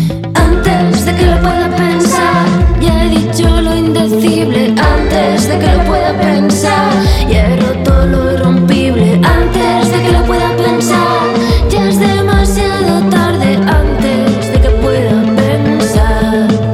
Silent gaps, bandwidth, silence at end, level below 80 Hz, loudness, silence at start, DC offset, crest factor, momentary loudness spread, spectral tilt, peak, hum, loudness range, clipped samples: none; 15.5 kHz; 0 s; -16 dBFS; -10 LUFS; 0 s; under 0.1%; 8 dB; 2 LU; -6 dB/octave; 0 dBFS; none; 1 LU; under 0.1%